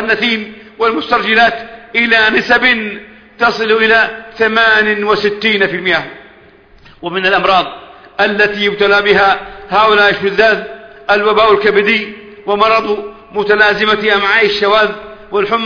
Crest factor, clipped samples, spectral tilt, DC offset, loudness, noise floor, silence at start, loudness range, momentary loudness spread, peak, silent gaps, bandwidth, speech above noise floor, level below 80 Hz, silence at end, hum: 12 dB; under 0.1%; -4.5 dB/octave; under 0.1%; -11 LUFS; -42 dBFS; 0 s; 3 LU; 12 LU; 0 dBFS; none; 5.4 kHz; 31 dB; -46 dBFS; 0 s; none